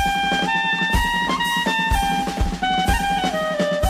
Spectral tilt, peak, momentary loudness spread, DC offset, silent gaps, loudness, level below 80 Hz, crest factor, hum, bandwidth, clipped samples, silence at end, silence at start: -4 dB/octave; -6 dBFS; 3 LU; under 0.1%; none; -20 LUFS; -30 dBFS; 14 dB; none; 15.5 kHz; under 0.1%; 0 s; 0 s